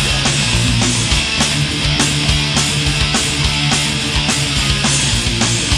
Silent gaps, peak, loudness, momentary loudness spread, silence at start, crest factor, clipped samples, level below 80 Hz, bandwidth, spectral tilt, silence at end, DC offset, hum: none; 0 dBFS; -14 LUFS; 1 LU; 0 s; 16 dB; under 0.1%; -26 dBFS; 14 kHz; -3 dB/octave; 0 s; under 0.1%; none